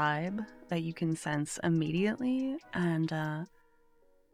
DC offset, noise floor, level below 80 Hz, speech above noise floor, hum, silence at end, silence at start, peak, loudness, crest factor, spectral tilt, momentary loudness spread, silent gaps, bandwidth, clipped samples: under 0.1%; -65 dBFS; -68 dBFS; 32 dB; none; 0.85 s; 0 s; -18 dBFS; -33 LUFS; 16 dB; -6 dB/octave; 7 LU; none; 14 kHz; under 0.1%